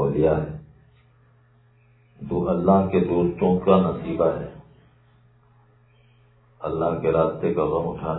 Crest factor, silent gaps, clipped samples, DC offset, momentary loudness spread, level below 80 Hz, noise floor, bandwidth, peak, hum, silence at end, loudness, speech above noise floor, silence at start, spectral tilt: 22 dB; none; under 0.1%; under 0.1%; 14 LU; -48 dBFS; -57 dBFS; 4.1 kHz; -2 dBFS; none; 0 s; -22 LUFS; 36 dB; 0 s; -12.5 dB/octave